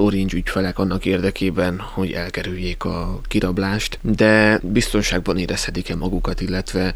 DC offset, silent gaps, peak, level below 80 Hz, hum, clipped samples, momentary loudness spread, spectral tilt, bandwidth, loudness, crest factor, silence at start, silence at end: under 0.1%; none; -2 dBFS; -30 dBFS; none; under 0.1%; 10 LU; -5.5 dB/octave; over 20 kHz; -20 LUFS; 16 dB; 0 s; 0 s